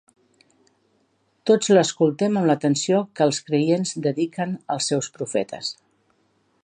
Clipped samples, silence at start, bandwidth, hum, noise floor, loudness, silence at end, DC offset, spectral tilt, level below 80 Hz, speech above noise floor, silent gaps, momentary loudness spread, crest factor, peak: under 0.1%; 1.45 s; 10 kHz; none; -66 dBFS; -22 LUFS; 0.9 s; under 0.1%; -5 dB/octave; -72 dBFS; 45 dB; none; 11 LU; 18 dB; -4 dBFS